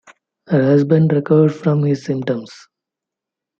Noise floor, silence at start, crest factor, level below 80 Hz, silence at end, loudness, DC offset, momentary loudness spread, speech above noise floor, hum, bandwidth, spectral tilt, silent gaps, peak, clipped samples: -85 dBFS; 0.5 s; 14 dB; -62 dBFS; 1.05 s; -16 LUFS; under 0.1%; 8 LU; 70 dB; none; 7.2 kHz; -9 dB/octave; none; -2 dBFS; under 0.1%